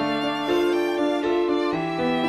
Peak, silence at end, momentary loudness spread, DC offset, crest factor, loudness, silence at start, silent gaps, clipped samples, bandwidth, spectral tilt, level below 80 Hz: -12 dBFS; 0 s; 3 LU; under 0.1%; 12 dB; -23 LUFS; 0 s; none; under 0.1%; 13.5 kHz; -5.5 dB/octave; -56 dBFS